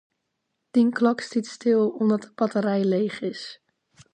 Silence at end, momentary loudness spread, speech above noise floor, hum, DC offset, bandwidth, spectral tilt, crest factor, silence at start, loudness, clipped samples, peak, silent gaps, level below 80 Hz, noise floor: 0.6 s; 10 LU; 55 dB; none; under 0.1%; 9.4 kHz; -6.5 dB/octave; 16 dB; 0.75 s; -24 LUFS; under 0.1%; -8 dBFS; none; -76 dBFS; -78 dBFS